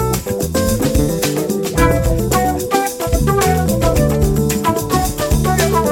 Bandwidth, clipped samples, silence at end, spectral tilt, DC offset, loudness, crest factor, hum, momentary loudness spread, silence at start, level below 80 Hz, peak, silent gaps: 17.5 kHz; under 0.1%; 0 s; -5.5 dB/octave; under 0.1%; -16 LUFS; 14 dB; none; 4 LU; 0 s; -22 dBFS; 0 dBFS; none